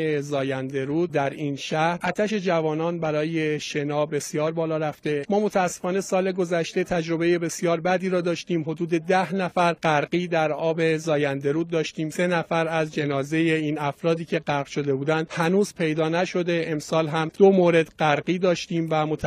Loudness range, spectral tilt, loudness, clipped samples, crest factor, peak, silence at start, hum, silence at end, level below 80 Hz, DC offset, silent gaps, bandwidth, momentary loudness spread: 3 LU; -5.5 dB/octave; -24 LUFS; under 0.1%; 18 dB; -4 dBFS; 0 s; none; 0 s; -62 dBFS; under 0.1%; none; 15 kHz; 4 LU